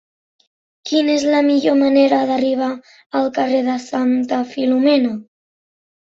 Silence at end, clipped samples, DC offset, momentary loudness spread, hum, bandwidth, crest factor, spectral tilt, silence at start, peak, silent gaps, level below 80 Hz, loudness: 0.8 s; under 0.1%; under 0.1%; 9 LU; none; 7.8 kHz; 14 dB; -4.5 dB/octave; 0.85 s; -2 dBFS; 3.06-3.10 s; -64 dBFS; -17 LUFS